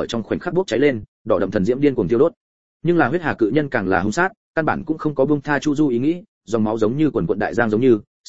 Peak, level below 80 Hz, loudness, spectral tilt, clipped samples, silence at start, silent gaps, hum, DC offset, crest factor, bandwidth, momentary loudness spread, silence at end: -2 dBFS; -48 dBFS; -19 LUFS; -7 dB/octave; under 0.1%; 0 s; 1.08-1.25 s, 2.37-2.80 s, 4.37-4.54 s, 6.28-6.41 s, 8.07-8.24 s; none; 1%; 18 dB; 8 kHz; 5 LU; 0 s